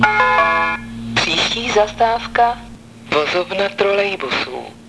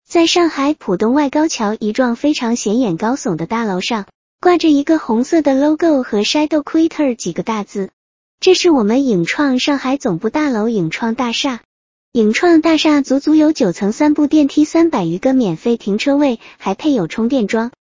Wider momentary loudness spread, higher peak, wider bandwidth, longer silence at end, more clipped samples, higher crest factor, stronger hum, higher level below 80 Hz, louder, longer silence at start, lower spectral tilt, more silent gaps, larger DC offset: about the same, 8 LU vs 7 LU; about the same, 0 dBFS vs 0 dBFS; first, 11 kHz vs 7.6 kHz; second, 0 s vs 0.15 s; neither; about the same, 18 dB vs 14 dB; neither; first, -44 dBFS vs -52 dBFS; about the same, -17 LUFS vs -15 LUFS; about the same, 0 s vs 0.1 s; second, -3 dB/octave vs -5 dB/octave; second, none vs 4.15-4.39 s, 7.93-8.38 s, 11.65-12.12 s; first, 0.2% vs under 0.1%